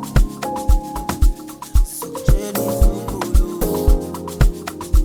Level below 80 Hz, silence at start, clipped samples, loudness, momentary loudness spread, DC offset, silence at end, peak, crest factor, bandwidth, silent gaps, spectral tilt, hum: -18 dBFS; 0 s; under 0.1%; -21 LUFS; 6 LU; under 0.1%; 0 s; 0 dBFS; 16 dB; 20 kHz; none; -6 dB/octave; none